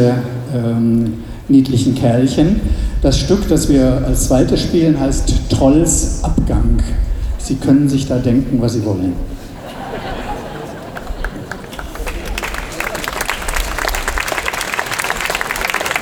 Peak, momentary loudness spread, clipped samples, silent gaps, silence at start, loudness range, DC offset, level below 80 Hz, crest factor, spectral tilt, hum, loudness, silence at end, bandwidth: 0 dBFS; 14 LU; under 0.1%; none; 0 s; 11 LU; under 0.1%; -22 dBFS; 14 dB; -5.5 dB/octave; none; -16 LUFS; 0 s; over 20 kHz